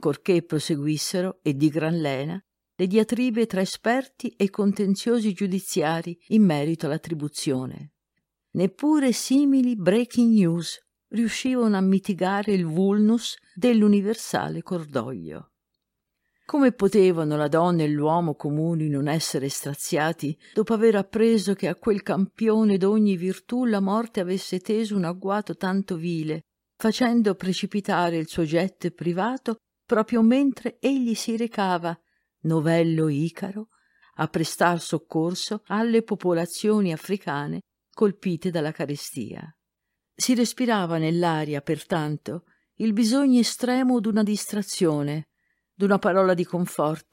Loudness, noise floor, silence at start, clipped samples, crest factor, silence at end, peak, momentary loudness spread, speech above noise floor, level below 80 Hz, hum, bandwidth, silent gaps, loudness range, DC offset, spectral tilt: -24 LUFS; -82 dBFS; 0 s; under 0.1%; 18 dB; 0.1 s; -6 dBFS; 10 LU; 59 dB; -66 dBFS; none; 16.5 kHz; none; 4 LU; under 0.1%; -6 dB/octave